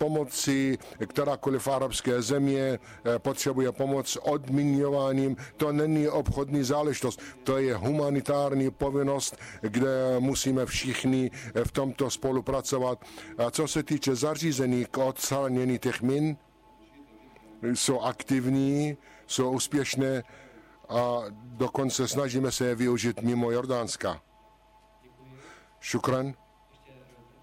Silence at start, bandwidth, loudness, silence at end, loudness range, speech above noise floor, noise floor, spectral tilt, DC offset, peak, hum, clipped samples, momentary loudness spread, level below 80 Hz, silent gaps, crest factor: 0 s; 16 kHz; -28 LUFS; 0.5 s; 3 LU; 31 dB; -59 dBFS; -5 dB/octave; under 0.1%; -16 dBFS; none; under 0.1%; 6 LU; -52 dBFS; none; 12 dB